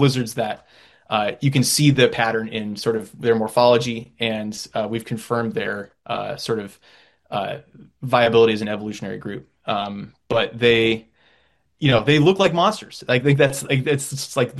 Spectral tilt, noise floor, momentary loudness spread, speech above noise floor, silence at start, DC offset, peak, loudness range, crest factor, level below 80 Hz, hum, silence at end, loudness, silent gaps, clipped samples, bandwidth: -5 dB/octave; -62 dBFS; 14 LU; 42 dB; 0 s; under 0.1%; -2 dBFS; 7 LU; 18 dB; -56 dBFS; none; 0 s; -20 LUFS; none; under 0.1%; 12.5 kHz